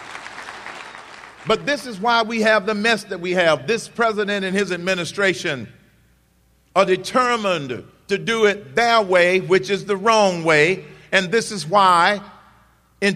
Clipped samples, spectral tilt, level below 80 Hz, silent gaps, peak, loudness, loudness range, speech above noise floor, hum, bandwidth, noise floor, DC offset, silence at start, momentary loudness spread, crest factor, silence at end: under 0.1%; -4 dB/octave; -58 dBFS; none; -2 dBFS; -18 LUFS; 5 LU; 40 dB; none; 14 kHz; -58 dBFS; under 0.1%; 0 s; 17 LU; 18 dB; 0 s